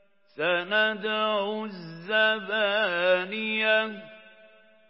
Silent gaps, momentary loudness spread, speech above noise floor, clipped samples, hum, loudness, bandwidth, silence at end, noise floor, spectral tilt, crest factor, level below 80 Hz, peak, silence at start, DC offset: none; 11 LU; 30 dB; under 0.1%; none; -25 LUFS; 5.8 kHz; 0.7 s; -56 dBFS; -8 dB/octave; 18 dB; -88 dBFS; -10 dBFS; 0.35 s; under 0.1%